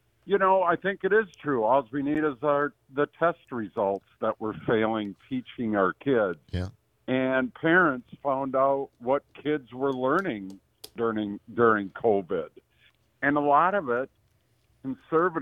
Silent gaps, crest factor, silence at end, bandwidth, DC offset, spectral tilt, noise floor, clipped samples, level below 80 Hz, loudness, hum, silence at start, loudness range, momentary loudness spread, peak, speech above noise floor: none; 20 dB; 0 s; 13.5 kHz; under 0.1%; -7.5 dB/octave; -67 dBFS; under 0.1%; -64 dBFS; -26 LUFS; none; 0.25 s; 3 LU; 13 LU; -8 dBFS; 41 dB